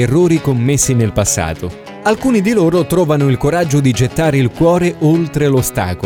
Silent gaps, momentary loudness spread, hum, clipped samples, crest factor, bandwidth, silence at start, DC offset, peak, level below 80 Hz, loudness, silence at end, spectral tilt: none; 5 LU; none; under 0.1%; 12 dB; 18.5 kHz; 0 s; under 0.1%; -2 dBFS; -34 dBFS; -13 LUFS; 0 s; -5.5 dB/octave